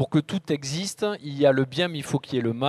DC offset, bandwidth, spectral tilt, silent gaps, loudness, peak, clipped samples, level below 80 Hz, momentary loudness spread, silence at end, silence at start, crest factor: under 0.1%; 14 kHz; -5.5 dB/octave; none; -25 LUFS; -6 dBFS; under 0.1%; -62 dBFS; 8 LU; 0 s; 0 s; 18 dB